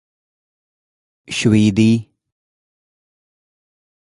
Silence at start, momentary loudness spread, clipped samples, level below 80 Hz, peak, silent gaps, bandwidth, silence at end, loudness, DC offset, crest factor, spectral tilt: 1.3 s; 8 LU; under 0.1%; -50 dBFS; -2 dBFS; none; 11.5 kHz; 2.15 s; -16 LUFS; under 0.1%; 20 dB; -6 dB/octave